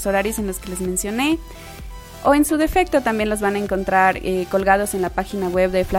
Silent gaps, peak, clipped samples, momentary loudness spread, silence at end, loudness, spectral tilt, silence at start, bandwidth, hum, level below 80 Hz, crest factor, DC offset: none; -2 dBFS; under 0.1%; 10 LU; 0 s; -20 LUFS; -4.5 dB/octave; 0 s; 17 kHz; none; -36 dBFS; 18 dB; under 0.1%